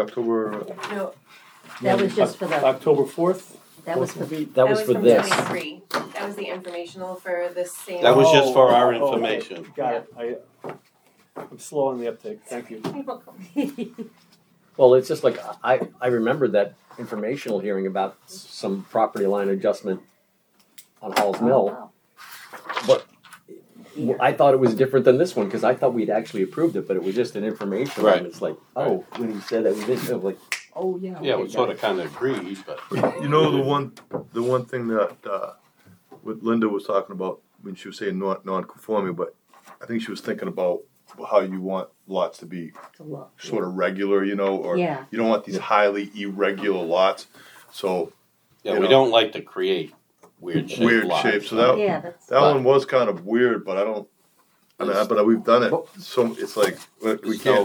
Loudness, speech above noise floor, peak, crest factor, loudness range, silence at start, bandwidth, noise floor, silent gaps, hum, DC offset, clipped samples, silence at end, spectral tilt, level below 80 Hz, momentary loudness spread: -22 LUFS; 41 dB; 0 dBFS; 22 dB; 8 LU; 0 s; over 20 kHz; -63 dBFS; none; none; under 0.1%; under 0.1%; 0 s; -5.5 dB/octave; -76 dBFS; 17 LU